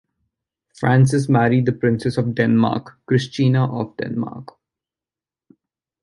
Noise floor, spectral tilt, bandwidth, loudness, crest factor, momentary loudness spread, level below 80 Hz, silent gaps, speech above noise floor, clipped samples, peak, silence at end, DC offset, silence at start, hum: under -90 dBFS; -7.5 dB/octave; 11.5 kHz; -19 LUFS; 18 dB; 11 LU; -56 dBFS; none; over 72 dB; under 0.1%; -2 dBFS; 1.6 s; under 0.1%; 0.8 s; none